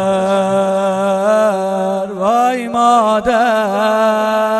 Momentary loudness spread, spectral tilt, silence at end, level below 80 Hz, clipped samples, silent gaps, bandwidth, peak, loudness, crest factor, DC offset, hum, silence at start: 5 LU; -5 dB/octave; 0 s; -50 dBFS; under 0.1%; none; 12 kHz; -2 dBFS; -14 LUFS; 12 dB; under 0.1%; none; 0 s